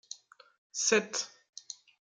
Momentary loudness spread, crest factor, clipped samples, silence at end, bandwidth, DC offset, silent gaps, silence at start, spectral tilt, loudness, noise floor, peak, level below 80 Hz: 20 LU; 22 dB; under 0.1%; 0.85 s; 10.5 kHz; under 0.1%; 0.58-0.70 s; 0.1 s; -1 dB/octave; -31 LUFS; -52 dBFS; -14 dBFS; -88 dBFS